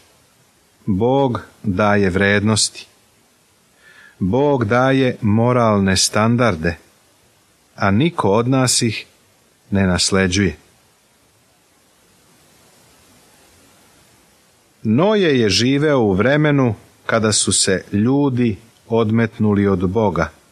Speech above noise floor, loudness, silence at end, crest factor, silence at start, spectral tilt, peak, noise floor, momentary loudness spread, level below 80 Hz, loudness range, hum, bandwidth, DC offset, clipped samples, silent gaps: 40 dB; -16 LUFS; 0.2 s; 16 dB; 0.85 s; -4.5 dB/octave; -2 dBFS; -56 dBFS; 8 LU; -46 dBFS; 6 LU; none; 14 kHz; under 0.1%; under 0.1%; none